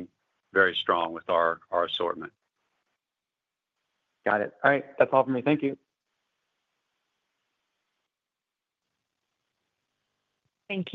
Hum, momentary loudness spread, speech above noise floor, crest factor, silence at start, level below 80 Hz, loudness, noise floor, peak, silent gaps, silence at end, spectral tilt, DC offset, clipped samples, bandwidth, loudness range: none; 11 LU; 63 dB; 24 dB; 0 s; -78 dBFS; -26 LUFS; -89 dBFS; -6 dBFS; none; 0 s; -7.5 dB/octave; under 0.1%; under 0.1%; 6.4 kHz; 6 LU